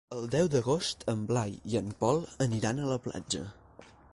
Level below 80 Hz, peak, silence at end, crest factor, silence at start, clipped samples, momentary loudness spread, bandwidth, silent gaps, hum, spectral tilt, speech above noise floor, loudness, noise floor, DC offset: -58 dBFS; -14 dBFS; 0.3 s; 18 dB; 0.1 s; under 0.1%; 8 LU; 11.5 kHz; none; none; -5.5 dB/octave; 24 dB; -31 LUFS; -55 dBFS; under 0.1%